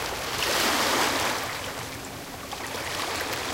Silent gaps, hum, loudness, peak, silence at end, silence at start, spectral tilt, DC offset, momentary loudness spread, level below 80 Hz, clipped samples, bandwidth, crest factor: none; none; -27 LUFS; -12 dBFS; 0 s; 0 s; -1.5 dB/octave; under 0.1%; 13 LU; -52 dBFS; under 0.1%; 17 kHz; 18 dB